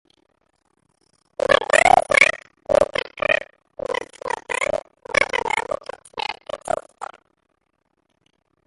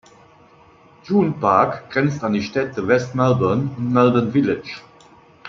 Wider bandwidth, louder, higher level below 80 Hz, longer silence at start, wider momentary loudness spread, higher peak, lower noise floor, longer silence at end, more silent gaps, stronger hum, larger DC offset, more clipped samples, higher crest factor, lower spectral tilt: first, 11.5 kHz vs 7.4 kHz; about the same, -20 LUFS vs -19 LUFS; first, -52 dBFS vs -58 dBFS; first, 1.5 s vs 1.05 s; first, 20 LU vs 7 LU; about the same, 0 dBFS vs -2 dBFS; first, -71 dBFS vs -50 dBFS; first, 1.6 s vs 0 s; neither; neither; neither; neither; about the same, 22 dB vs 18 dB; second, -2 dB/octave vs -7.5 dB/octave